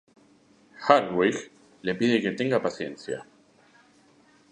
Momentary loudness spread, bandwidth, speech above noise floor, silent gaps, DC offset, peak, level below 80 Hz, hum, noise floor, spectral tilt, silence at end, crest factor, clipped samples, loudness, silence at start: 15 LU; 10 kHz; 34 dB; none; under 0.1%; -2 dBFS; -68 dBFS; none; -59 dBFS; -5.5 dB/octave; 1.3 s; 26 dB; under 0.1%; -26 LUFS; 0.8 s